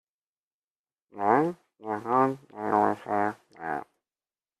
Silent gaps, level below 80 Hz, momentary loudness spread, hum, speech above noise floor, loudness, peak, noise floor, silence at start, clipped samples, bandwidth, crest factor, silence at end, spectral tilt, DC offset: none; -74 dBFS; 11 LU; none; over 63 dB; -28 LUFS; -8 dBFS; under -90 dBFS; 1.15 s; under 0.1%; 13 kHz; 22 dB; 0.75 s; -8 dB/octave; under 0.1%